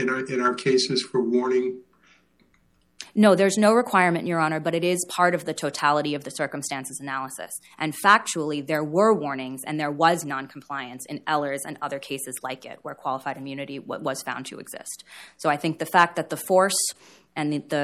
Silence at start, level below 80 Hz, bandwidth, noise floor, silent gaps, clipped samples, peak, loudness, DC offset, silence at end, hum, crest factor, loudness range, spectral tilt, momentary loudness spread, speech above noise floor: 0 s; -72 dBFS; 16 kHz; -64 dBFS; none; under 0.1%; -4 dBFS; -24 LUFS; under 0.1%; 0 s; none; 20 dB; 9 LU; -4 dB/octave; 15 LU; 40 dB